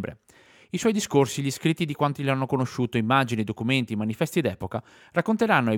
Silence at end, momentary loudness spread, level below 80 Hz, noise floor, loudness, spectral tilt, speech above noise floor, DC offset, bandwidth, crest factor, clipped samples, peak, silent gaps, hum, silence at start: 0 s; 7 LU; -62 dBFS; -55 dBFS; -25 LUFS; -5.5 dB/octave; 31 dB; under 0.1%; 18 kHz; 20 dB; under 0.1%; -4 dBFS; none; none; 0 s